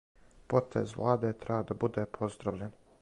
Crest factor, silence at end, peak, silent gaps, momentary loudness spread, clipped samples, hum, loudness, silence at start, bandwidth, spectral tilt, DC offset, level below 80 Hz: 20 dB; 0.3 s; -12 dBFS; none; 8 LU; under 0.1%; none; -33 LUFS; 0.5 s; 11 kHz; -8 dB/octave; under 0.1%; -60 dBFS